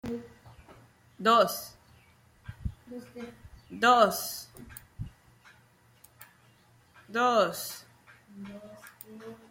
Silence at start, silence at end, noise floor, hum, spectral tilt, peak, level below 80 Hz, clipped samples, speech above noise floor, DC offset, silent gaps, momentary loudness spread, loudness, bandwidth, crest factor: 0.05 s; 0.15 s; -62 dBFS; none; -3.5 dB/octave; -6 dBFS; -56 dBFS; under 0.1%; 34 dB; under 0.1%; none; 24 LU; -27 LUFS; 16.5 kHz; 26 dB